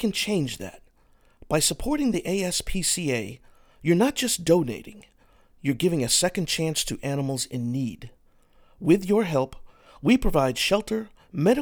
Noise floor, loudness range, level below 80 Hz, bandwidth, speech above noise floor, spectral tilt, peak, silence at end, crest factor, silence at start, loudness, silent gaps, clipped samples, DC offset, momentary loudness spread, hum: -59 dBFS; 2 LU; -42 dBFS; over 20 kHz; 35 dB; -4 dB/octave; -6 dBFS; 0 s; 20 dB; 0 s; -24 LUFS; none; under 0.1%; under 0.1%; 11 LU; none